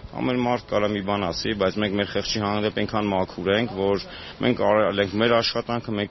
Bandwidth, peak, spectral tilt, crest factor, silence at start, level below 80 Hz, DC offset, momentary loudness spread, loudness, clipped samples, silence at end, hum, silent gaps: 6.2 kHz; -6 dBFS; -3.5 dB/octave; 18 dB; 0 s; -48 dBFS; under 0.1%; 6 LU; -23 LUFS; under 0.1%; 0 s; none; none